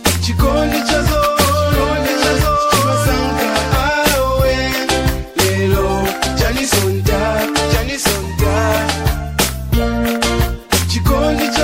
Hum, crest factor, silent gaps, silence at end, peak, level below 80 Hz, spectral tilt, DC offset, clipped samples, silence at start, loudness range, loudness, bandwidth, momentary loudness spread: none; 14 dB; none; 0 s; 0 dBFS; -24 dBFS; -4.5 dB/octave; under 0.1%; under 0.1%; 0 s; 2 LU; -15 LUFS; 16.5 kHz; 4 LU